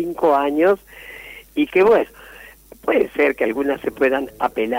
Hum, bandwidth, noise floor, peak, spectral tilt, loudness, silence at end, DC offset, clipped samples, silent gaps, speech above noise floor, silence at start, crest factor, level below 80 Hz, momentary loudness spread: none; 16 kHz; -42 dBFS; -6 dBFS; -5.5 dB/octave; -19 LUFS; 0 s; under 0.1%; under 0.1%; none; 24 dB; 0 s; 14 dB; -52 dBFS; 15 LU